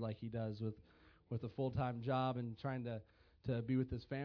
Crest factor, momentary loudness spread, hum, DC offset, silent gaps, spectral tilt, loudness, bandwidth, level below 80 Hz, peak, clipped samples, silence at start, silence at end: 16 dB; 9 LU; none; under 0.1%; none; -7 dB/octave; -42 LUFS; 5.4 kHz; -64 dBFS; -26 dBFS; under 0.1%; 0 s; 0 s